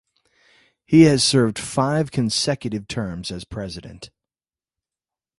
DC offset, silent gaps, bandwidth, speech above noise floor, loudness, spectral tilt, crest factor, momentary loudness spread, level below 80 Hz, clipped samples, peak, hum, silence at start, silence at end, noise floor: under 0.1%; none; 11.5 kHz; over 70 dB; -19 LUFS; -5 dB/octave; 20 dB; 17 LU; -50 dBFS; under 0.1%; -2 dBFS; none; 0.9 s; 1.35 s; under -90 dBFS